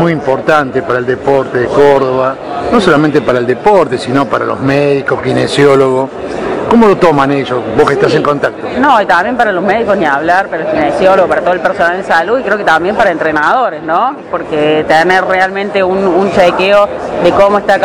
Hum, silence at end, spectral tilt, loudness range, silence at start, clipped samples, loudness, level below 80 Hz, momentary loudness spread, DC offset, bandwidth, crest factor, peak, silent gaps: none; 0 s; -6 dB/octave; 1 LU; 0 s; 2%; -10 LUFS; -40 dBFS; 6 LU; 0.3%; 12 kHz; 10 dB; 0 dBFS; none